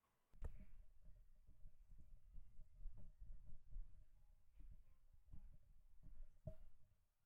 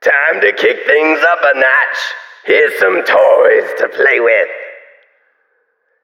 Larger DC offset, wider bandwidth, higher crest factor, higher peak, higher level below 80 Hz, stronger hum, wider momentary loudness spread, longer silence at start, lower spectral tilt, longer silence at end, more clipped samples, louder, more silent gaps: neither; second, 2.9 kHz vs 16 kHz; about the same, 16 dB vs 12 dB; second, -40 dBFS vs 0 dBFS; first, -60 dBFS vs -66 dBFS; neither; second, 8 LU vs 11 LU; first, 0.35 s vs 0 s; first, -9 dB/octave vs -2.5 dB/octave; second, 0.25 s vs 1.25 s; neither; second, -65 LUFS vs -10 LUFS; neither